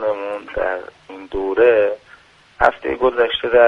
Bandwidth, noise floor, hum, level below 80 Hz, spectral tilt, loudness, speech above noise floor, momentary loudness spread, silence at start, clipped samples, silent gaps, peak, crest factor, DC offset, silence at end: 6.4 kHz; -48 dBFS; none; -44 dBFS; -5.5 dB/octave; -18 LUFS; 32 dB; 15 LU; 0 s; under 0.1%; none; 0 dBFS; 18 dB; under 0.1%; 0 s